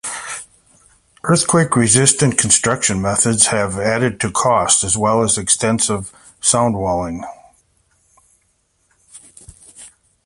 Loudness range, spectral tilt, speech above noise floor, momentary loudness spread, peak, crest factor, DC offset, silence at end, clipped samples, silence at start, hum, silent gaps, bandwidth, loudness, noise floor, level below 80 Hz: 8 LU; -3.5 dB/octave; 47 dB; 14 LU; 0 dBFS; 18 dB; under 0.1%; 0.35 s; under 0.1%; 0.05 s; none; none; 16 kHz; -15 LUFS; -63 dBFS; -44 dBFS